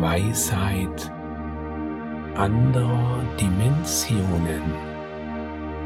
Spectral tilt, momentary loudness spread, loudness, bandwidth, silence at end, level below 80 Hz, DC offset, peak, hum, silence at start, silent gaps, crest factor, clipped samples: -5.5 dB/octave; 12 LU; -24 LUFS; 17 kHz; 0 s; -38 dBFS; under 0.1%; -6 dBFS; none; 0 s; none; 18 dB; under 0.1%